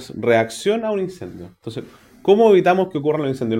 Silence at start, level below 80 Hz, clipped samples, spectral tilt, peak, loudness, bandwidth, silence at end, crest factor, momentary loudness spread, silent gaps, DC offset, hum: 0 s; -58 dBFS; under 0.1%; -6 dB/octave; -2 dBFS; -18 LUFS; 15 kHz; 0 s; 18 dB; 21 LU; none; under 0.1%; none